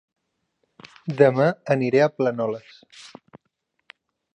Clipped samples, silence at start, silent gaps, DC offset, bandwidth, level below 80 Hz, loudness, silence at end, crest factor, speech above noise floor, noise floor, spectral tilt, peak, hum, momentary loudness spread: under 0.1%; 1.05 s; none; under 0.1%; 9 kHz; -74 dBFS; -21 LUFS; 1.3 s; 22 dB; 54 dB; -75 dBFS; -7.5 dB/octave; -2 dBFS; none; 19 LU